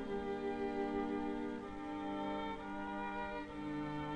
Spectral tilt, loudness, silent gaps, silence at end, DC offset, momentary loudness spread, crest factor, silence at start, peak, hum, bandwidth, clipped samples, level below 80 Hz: -7 dB/octave; -42 LUFS; none; 0 s; under 0.1%; 5 LU; 14 dB; 0 s; -28 dBFS; none; 10 kHz; under 0.1%; -60 dBFS